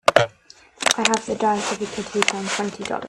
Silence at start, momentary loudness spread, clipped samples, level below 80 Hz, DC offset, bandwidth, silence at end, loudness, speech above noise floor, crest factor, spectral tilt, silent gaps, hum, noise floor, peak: 0.05 s; 8 LU; under 0.1%; -60 dBFS; under 0.1%; 15 kHz; 0 s; -22 LUFS; 27 dB; 22 dB; -2.5 dB/octave; none; none; -50 dBFS; 0 dBFS